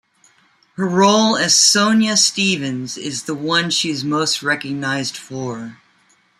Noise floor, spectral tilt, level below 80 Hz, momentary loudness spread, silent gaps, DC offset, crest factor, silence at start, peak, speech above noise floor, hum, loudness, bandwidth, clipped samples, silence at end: -57 dBFS; -2.5 dB/octave; -64 dBFS; 16 LU; none; under 0.1%; 18 dB; 0.8 s; 0 dBFS; 40 dB; none; -16 LUFS; 15 kHz; under 0.1%; 0.65 s